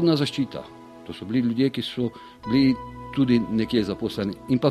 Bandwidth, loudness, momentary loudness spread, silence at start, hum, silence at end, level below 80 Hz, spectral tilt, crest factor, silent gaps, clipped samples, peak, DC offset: 13 kHz; -24 LUFS; 17 LU; 0 s; none; 0 s; -52 dBFS; -7 dB/octave; 18 dB; none; under 0.1%; -6 dBFS; under 0.1%